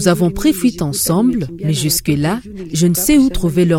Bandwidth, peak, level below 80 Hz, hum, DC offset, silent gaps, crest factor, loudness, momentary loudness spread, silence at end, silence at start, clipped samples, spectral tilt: 17.5 kHz; 0 dBFS; -32 dBFS; none; under 0.1%; none; 14 dB; -15 LUFS; 7 LU; 0 s; 0 s; under 0.1%; -5 dB/octave